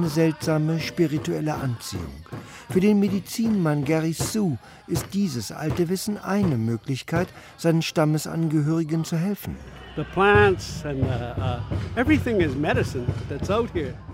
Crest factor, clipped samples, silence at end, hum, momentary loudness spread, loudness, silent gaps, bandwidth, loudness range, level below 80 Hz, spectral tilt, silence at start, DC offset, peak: 18 dB; under 0.1%; 0 s; none; 10 LU; -24 LUFS; none; 16 kHz; 3 LU; -44 dBFS; -6 dB/octave; 0 s; under 0.1%; -4 dBFS